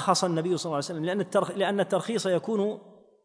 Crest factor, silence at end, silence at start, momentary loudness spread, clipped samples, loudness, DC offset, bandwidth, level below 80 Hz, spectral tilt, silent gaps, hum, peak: 18 dB; 0.35 s; 0 s; 5 LU; under 0.1%; -27 LUFS; under 0.1%; 10.5 kHz; -76 dBFS; -4.5 dB/octave; none; none; -8 dBFS